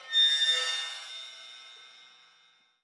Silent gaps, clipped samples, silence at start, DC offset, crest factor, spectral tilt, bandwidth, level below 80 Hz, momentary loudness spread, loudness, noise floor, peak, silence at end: none; under 0.1%; 0 s; under 0.1%; 16 dB; 5.5 dB/octave; 11.5 kHz; under -90 dBFS; 25 LU; -25 LUFS; -64 dBFS; -16 dBFS; 0.95 s